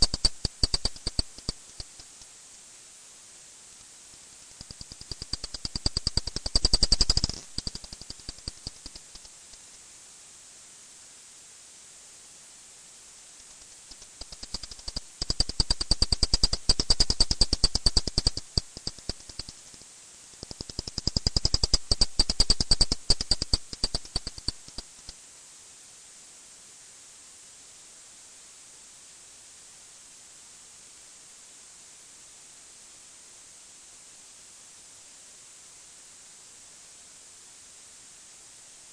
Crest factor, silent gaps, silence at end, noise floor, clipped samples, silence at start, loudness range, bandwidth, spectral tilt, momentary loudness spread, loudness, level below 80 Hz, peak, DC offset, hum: 24 dB; none; 0.8 s; -50 dBFS; under 0.1%; 0 s; 22 LU; 10.5 kHz; -2 dB/octave; 23 LU; -27 LUFS; -36 dBFS; -8 dBFS; under 0.1%; none